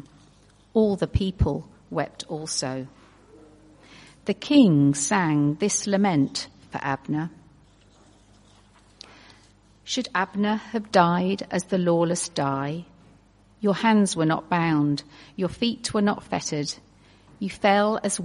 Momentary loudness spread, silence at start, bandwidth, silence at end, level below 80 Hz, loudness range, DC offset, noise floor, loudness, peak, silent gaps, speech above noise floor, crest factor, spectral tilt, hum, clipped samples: 12 LU; 0.75 s; 11.5 kHz; 0 s; -46 dBFS; 9 LU; under 0.1%; -56 dBFS; -24 LUFS; -2 dBFS; none; 33 dB; 22 dB; -5 dB/octave; 50 Hz at -50 dBFS; under 0.1%